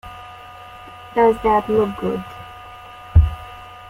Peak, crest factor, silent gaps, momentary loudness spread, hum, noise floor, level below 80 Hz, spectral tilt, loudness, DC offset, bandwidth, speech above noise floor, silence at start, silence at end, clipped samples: -2 dBFS; 18 dB; none; 21 LU; none; -39 dBFS; -28 dBFS; -8.5 dB/octave; -19 LUFS; under 0.1%; 11 kHz; 21 dB; 0.05 s; 0 s; under 0.1%